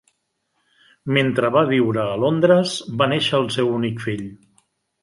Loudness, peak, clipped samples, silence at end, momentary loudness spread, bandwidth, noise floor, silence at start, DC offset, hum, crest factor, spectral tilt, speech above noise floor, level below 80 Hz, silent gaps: -19 LUFS; -2 dBFS; under 0.1%; 0.7 s; 11 LU; 11.5 kHz; -72 dBFS; 1.05 s; under 0.1%; none; 18 dB; -6 dB/octave; 53 dB; -60 dBFS; none